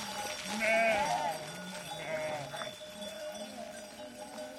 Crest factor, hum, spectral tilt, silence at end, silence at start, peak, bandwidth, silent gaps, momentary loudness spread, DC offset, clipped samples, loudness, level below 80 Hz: 18 dB; none; -2.5 dB/octave; 0 s; 0 s; -18 dBFS; 16.5 kHz; none; 17 LU; under 0.1%; under 0.1%; -35 LUFS; -70 dBFS